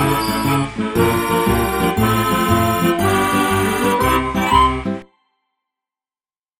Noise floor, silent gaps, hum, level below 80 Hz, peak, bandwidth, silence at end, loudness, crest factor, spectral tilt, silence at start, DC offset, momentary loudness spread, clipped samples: under -90 dBFS; none; none; -34 dBFS; 0 dBFS; 16.5 kHz; 1.55 s; -16 LUFS; 16 dB; -5 dB/octave; 0 s; under 0.1%; 4 LU; under 0.1%